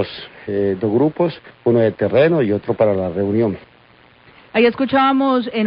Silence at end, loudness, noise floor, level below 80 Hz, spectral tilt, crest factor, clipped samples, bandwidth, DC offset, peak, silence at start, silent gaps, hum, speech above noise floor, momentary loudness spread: 0 s; -17 LUFS; -49 dBFS; -50 dBFS; -12 dB/octave; 14 dB; under 0.1%; 5.4 kHz; under 0.1%; -4 dBFS; 0 s; none; none; 32 dB; 8 LU